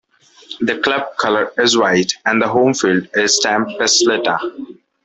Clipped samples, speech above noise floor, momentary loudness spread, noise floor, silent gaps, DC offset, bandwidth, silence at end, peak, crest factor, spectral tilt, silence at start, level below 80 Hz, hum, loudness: under 0.1%; 23 dB; 9 LU; -38 dBFS; none; under 0.1%; 8.4 kHz; 0.3 s; 0 dBFS; 16 dB; -2.5 dB/octave; 0.5 s; -58 dBFS; none; -15 LUFS